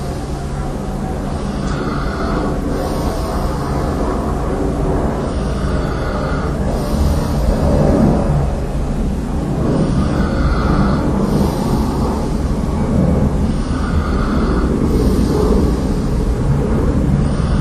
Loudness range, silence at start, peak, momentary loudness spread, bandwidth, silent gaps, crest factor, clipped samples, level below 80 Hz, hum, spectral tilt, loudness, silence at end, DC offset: 3 LU; 0 s; 0 dBFS; 6 LU; 13 kHz; none; 16 dB; under 0.1%; -20 dBFS; none; -7.5 dB/octave; -17 LUFS; 0 s; under 0.1%